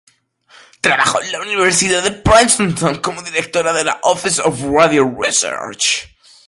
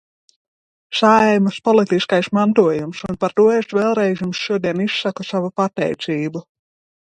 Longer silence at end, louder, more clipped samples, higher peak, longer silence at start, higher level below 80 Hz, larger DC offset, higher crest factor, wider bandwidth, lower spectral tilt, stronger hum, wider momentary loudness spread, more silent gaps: second, 0.4 s vs 0.7 s; first, -14 LUFS vs -18 LUFS; neither; about the same, 0 dBFS vs -2 dBFS; about the same, 0.85 s vs 0.9 s; first, -38 dBFS vs -58 dBFS; neither; about the same, 16 dB vs 16 dB; first, 11.5 kHz vs 9.4 kHz; second, -2.5 dB/octave vs -6 dB/octave; neither; about the same, 8 LU vs 9 LU; neither